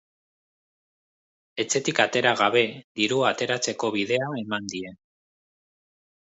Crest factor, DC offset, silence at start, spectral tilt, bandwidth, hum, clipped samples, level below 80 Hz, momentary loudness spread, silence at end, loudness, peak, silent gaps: 24 dB; under 0.1%; 1.55 s; -3 dB/octave; 8.2 kHz; none; under 0.1%; -70 dBFS; 12 LU; 1.4 s; -24 LUFS; -4 dBFS; 2.84-2.95 s